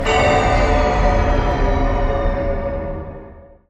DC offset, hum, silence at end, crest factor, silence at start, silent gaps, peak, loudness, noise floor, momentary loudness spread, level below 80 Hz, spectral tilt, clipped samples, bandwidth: under 0.1%; none; 0.3 s; 14 dB; 0 s; none; -4 dBFS; -18 LUFS; -40 dBFS; 13 LU; -20 dBFS; -6 dB/octave; under 0.1%; 8.4 kHz